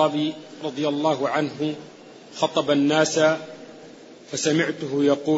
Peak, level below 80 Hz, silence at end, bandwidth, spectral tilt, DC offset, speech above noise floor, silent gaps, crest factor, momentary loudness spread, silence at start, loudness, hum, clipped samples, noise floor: -6 dBFS; -70 dBFS; 0 s; 8 kHz; -4.5 dB/octave; under 0.1%; 22 dB; none; 18 dB; 20 LU; 0 s; -23 LUFS; none; under 0.1%; -44 dBFS